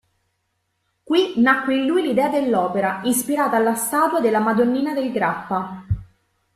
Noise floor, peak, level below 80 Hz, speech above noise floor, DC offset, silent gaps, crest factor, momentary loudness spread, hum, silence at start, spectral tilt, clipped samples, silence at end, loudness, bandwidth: -72 dBFS; -2 dBFS; -48 dBFS; 53 dB; under 0.1%; none; 18 dB; 9 LU; none; 1.1 s; -4.5 dB/octave; under 0.1%; 0.5 s; -20 LUFS; 14.5 kHz